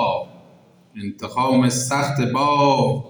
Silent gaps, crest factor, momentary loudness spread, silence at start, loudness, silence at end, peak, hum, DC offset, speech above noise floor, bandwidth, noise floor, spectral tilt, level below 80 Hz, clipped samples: none; 16 dB; 16 LU; 0 s; -19 LUFS; 0 s; -4 dBFS; none; under 0.1%; 32 dB; over 20 kHz; -51 dBFS; -5 dB/octave; -62 dBFS; under 0.1%